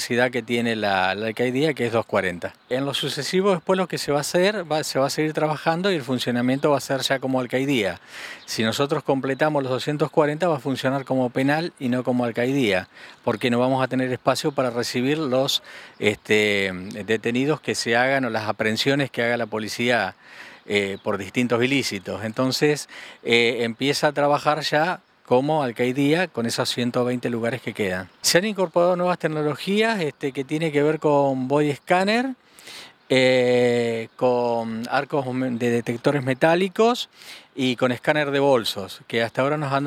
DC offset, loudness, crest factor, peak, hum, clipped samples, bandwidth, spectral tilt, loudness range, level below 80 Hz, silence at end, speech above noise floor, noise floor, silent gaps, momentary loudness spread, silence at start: under 0.1%; -22 LUFS; 20 dB; -2 dBFS; none; under 0.1%; 16.5 kHz; -4.5 dB/octave; 2 LU; -66 dBFS; 0 s; 20 dB; -43 dBFS; none; 8 LU; 0 s